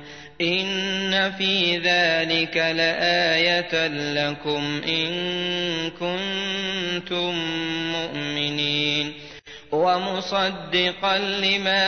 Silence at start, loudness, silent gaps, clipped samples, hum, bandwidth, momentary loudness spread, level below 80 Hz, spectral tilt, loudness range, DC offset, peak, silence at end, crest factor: 0 s; -22 LUFS; none; under 0.1%; none; 6.6 kHz; 7 LU; -58 dBFS; -4 dB/octave; 5 LU; 0.2%; -8 dBFS; 0 s; 16 dB